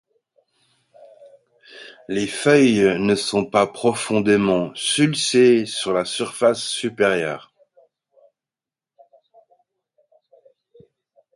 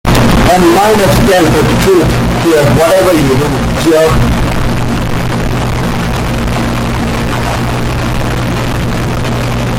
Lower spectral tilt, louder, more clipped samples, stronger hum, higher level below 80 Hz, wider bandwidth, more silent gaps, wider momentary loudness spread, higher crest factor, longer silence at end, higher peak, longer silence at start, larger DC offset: about the same, -4.5 dB/octave vs -5.5 dB/octave; second, -19 LUFS vs -10 LUFS; neither; neither; second, -60 dBFS vs -20 dBFS; second, 11.5 kHz vs 17 kHz; neither; first, 11 LU vs 7 LU; first, 20 dB vs 10 dB; first, 3.95 s vs 0 s; about the same, -2 dBFS vs 0 dBFS; first, 1.7 s vs 0.05 s; neither